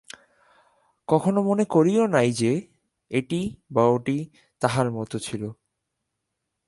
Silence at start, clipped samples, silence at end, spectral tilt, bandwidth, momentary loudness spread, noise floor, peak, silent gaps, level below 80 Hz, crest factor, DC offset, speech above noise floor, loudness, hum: 1.1 s; under 0.1%; 1.15 s; -6.5 dB/octave; 11.5 kHz; 12 LU; -81 dBFS; -4 dBFS; none; -62 dBFS; 20 dB; under 0.1%; 58 dB; -24 LUFS; none